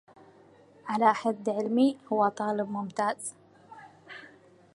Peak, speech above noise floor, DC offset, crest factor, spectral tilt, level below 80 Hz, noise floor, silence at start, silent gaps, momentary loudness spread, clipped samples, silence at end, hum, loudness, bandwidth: -8 dBFS; 29 dB; under 0.1%; 22 dB; -5 dB/octave; -80 dBFS; -57 dBFS; 0.85 s; none; 21 LU; under 0.1%; 0.5 s; none; -28 LUFS; 11.5 kHz